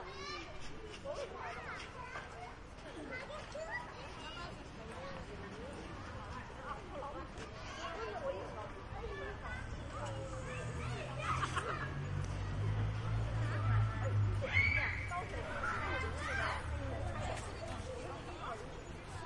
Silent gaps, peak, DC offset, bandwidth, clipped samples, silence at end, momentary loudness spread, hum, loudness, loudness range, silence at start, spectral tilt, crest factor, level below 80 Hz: none; -18 dBFS; under 0.1%; 11 kHz; under 0.1%; 0 s; 12 LU; none; -41 LUFS; 11 LU; 0 s; -5.5 dB/octave; 22 dB; -50 dBFS